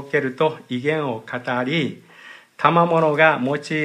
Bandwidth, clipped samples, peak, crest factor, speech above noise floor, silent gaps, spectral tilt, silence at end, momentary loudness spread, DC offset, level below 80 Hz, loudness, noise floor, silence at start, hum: 11 kHz; under 0.1%; 0 dBFS; 20 dB; 25 dB; none; -6.5 dB/octave; 0 s; 11 LU; under 0.1%; -72 dBFS; -20 LUFS; -44 dBFS; 0 s; none